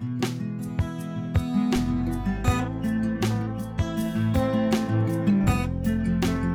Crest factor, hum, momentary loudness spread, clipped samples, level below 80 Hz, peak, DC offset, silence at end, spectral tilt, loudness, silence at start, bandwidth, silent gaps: 14 dB; none; 6 LU; under 0.1%; -36 dBFS; -10 dBFS; under 0.1%; 0 s; -7 dB/octave; -26 LUFS; 0 s; over 20 kHz; none